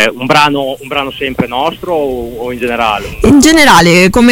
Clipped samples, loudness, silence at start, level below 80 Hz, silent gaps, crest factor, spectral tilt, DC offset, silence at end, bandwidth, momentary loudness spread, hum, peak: 0.7%; -9 LUFS; 0 s; -30 dBFS; none; 10 dB; -4 dB/octave; under 0.1%; 0 s; 17.5 kHz; 12 LU; none; 0 dBFS